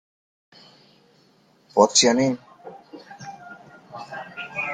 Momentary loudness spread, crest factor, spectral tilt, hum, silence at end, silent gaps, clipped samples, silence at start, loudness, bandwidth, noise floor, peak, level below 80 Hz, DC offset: 28 LU; 26 dB; -2.5 dB/octave; none; 0 s; none; under 0.1%; 1.75 s; -20 LUFS; 10 kHz; -59 dBFS; 0 dBFS; -68 dBFS; under 0.1%